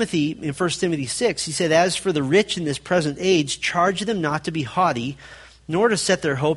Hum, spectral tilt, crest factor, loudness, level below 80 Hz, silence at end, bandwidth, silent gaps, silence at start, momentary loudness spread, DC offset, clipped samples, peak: none; -4.5 dB/octave; 18 dB; -21 LUFS; -54 dBFS; 0 s; 11.5 kHz; none; 0 s; 7 LU; under 0.1%; under 0.1%; -4 dBFS